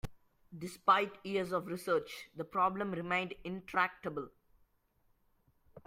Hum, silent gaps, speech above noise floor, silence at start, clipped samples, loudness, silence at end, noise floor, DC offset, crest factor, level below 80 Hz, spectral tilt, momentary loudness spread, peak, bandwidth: none; none; 39 dB; 0.05 s; under 0.1%; -35 LUFS; 0.05 s; -74 dBFS; under 0.1%; 22 dB; -62 dBFS; -5 dB/octave; 17 LU; -14 dBFS; 16 kHz